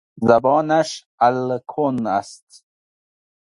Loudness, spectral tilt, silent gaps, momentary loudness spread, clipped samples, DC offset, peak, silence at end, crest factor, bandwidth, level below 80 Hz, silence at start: -19 LUFS; -6 dB/octave; 1.06-1.18 s; 9 LU; under 0.1%; under 0.1%; 0 dBFS; 1.05 s; 20 dB; 11.5 kHz; -60 dBFS; 0.15 s